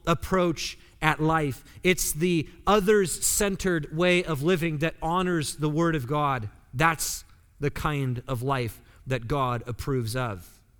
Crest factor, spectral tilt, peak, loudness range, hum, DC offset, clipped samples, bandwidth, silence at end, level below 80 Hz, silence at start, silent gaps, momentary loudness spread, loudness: 22 dB; -4.5 dB/octave; -4 dBFS; 6 LU; none; under 0.1%; under 0.1%; 20 kHz; 0.35 s; -44 dBFS; 0.05 s; none; 9 LU; -26 LUFS